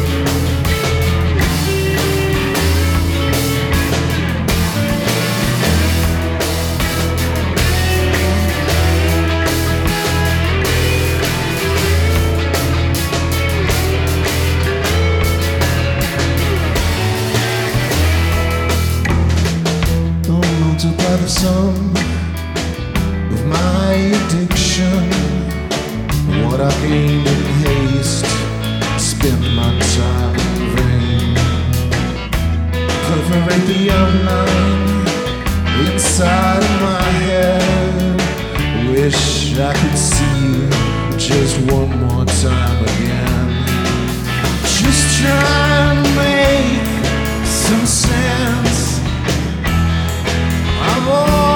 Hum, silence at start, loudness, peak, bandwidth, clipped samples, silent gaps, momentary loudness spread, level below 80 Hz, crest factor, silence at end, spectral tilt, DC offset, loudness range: none; 0 s; -15 LUFS; 0 dBFS; 19.5 kHz; under 0.1%; none; 5 LU; -22 dBFS; 14 dB; 0 s; -5 dB/octave; under 0.1%; 2 LU